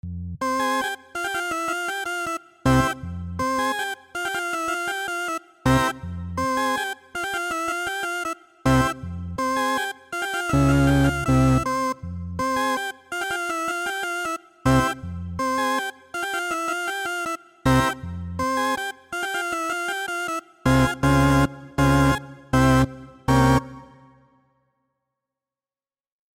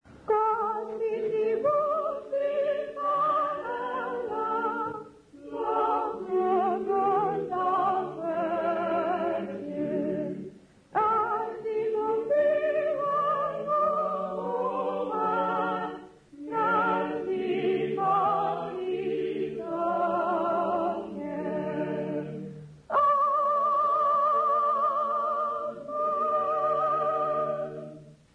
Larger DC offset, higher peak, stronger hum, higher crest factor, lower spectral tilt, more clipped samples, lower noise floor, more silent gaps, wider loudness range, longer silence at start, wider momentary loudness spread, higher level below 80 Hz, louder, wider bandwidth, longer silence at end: neither; first, -8 dBFS vs -14 dBFS; neither; about the same, 14 dB vs 12 dB; second, -5.5 dB/octave vs -7.5 dB/octave; neither; first, under -90 dBFS vs -48 dBFS; neither; about the same, 4 LU vs 4 LU; about the same, 0.05 s vs 0.1 s; about the same, 11 LU vs 9 LU; first, -38 dBFS vs -66 dBFS; first, -24 LUFS vs -28 LUFS; first, 17 kHz vs 9.8 kHz; first, 2.5 s vs 0.2 s